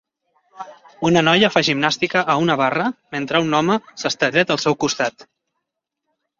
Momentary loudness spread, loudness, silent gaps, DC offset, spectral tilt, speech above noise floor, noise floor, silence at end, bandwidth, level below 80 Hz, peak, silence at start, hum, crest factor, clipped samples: 11 LU; -18 LUFS; none; under 0.1%; -4.5 dB/octave; 61 dB; -80 dBFS; 1.15 s; 7.6 kHz; -60 dBFS; -2 dBFS; 0.55 s; none; 18 dB; under 0.1%